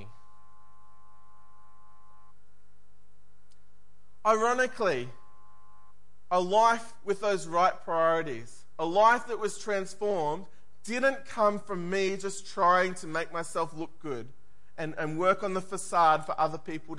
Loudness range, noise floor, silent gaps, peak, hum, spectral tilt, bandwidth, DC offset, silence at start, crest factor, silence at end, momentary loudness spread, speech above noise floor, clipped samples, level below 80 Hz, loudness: 4 LU; -67 dBFS; none; -10 dBFS; none; -4 dB/octave; 11.5 kHz; 1%; 0 s; 20 dB; 0 s; 15 LU; 39 dB; under 0.1%; -70 dBFS; -28 LUFS